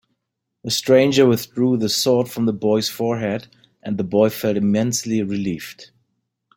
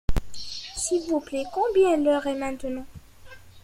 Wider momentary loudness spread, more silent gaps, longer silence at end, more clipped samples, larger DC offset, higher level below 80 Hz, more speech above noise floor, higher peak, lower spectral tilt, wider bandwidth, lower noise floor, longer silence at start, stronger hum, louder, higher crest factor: about the same, 13 LU vs 15 LU; neither; first, 0.7 s vs 0.05 s; neither; neither; second, -58 dBFS vs -36 dBFS; first, 60 dB vs 22 dB; first, -2 dBFS vs -10 dBFS; about the same, -5 dB/octave vs -4.5 dB/octave; about the same, 17 kHz vs 16 kHz; first, -78 dBFS vs -46 dBFS; first, 0.65 s vs 0.1 s; neither; first, -19 LUFS vs -26 LUFS; about the same, 18 dB vs 16 dB